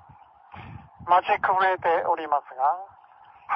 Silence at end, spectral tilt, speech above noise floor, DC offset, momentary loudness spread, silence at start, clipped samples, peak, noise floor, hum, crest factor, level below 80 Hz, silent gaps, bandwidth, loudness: 0 s; -6.5 dB/octave; 29 dB; under 0.1%; 22 LU; 0.55 s; under 0.1%; -8 dBFS; -52 dBFS; none; 18 dB; -62 dBFS; none; 5.8 kHz; -24 LUFS